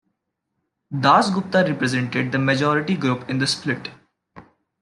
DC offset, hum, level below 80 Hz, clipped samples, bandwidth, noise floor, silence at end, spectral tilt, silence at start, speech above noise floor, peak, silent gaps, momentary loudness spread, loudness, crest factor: under 0.1%; none; -64 dBFS; under 0.1%; 11.5 kHz; -77 dBFS; 0.4 s; -5.5 dB/octave; 0.9 s; 57 dB; -2 dBFS; none; 10 LU; -20 LUFS; 20 dB